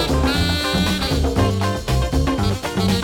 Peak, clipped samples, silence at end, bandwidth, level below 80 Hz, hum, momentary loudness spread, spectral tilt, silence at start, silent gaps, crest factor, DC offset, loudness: -4 dBFS; under 0.1%; 0 s; 18 kHz; -26 dBFS; none; 3 LU; -5 dB/octave; 0 s; none; 14 dB; under 0.1%; -19 LUFS